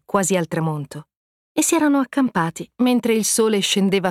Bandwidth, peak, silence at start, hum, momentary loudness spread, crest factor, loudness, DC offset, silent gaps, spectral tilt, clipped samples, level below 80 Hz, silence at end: 16.5 kHz; -6 dBFS; 0.15 s; none; 10 LU; 14 dB; -19 LUFS; under 0.1%; 1.17-1.55 s; -4 dB/octave; under 0.1%; -62 dBFS; 0 s